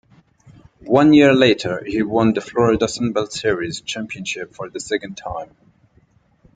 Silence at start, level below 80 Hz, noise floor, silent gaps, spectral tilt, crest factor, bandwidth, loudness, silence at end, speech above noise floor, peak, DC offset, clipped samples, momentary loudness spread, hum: 0.85 s; -50 dBFS; -57 dBFS; none; -5.5 dB/octave; 18 dB; 9.4 kHz; -18 LUFS; 1.1 s; 39 dB; -2 dBFS; under 0.1%; under 0.1%; 18 LU; none